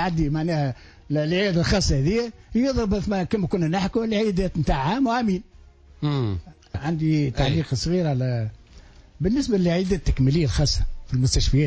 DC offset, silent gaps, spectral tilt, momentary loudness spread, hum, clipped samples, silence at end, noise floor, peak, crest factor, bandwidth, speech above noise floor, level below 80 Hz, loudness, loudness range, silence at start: under 0.1%; none; -6 dB/octave; 7 LU; none; under 0.1%; 0 s; -49 dBFS; -10 dBFS; 12 dB; 8 kHz; 27 dB; -32 dBFS; -23 LUFS; 2 LU; 0 s